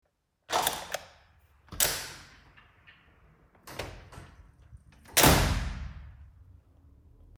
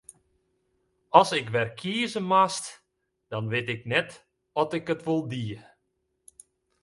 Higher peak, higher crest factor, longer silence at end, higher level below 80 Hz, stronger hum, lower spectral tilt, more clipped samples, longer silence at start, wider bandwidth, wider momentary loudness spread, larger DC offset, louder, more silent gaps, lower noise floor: second, -6 dBFS vs -2 dBFS; about the same, 26 dB vs 28 dB; about the same, 1.1 s vs 1.2 s; first, -42 dBFS vs -68 dBFS; neither; second, -3 dB/octave vs -4.5 dB/octave; neither; second, 0.5 s vs 1.15 s; first, 19 kHz vs 11.5 kHz; first, 28 LU vs 15 LU; neither; about the same, -27 LUFS vs -26 LUFS; neither; second, -62 dBFS vs -77 dBFS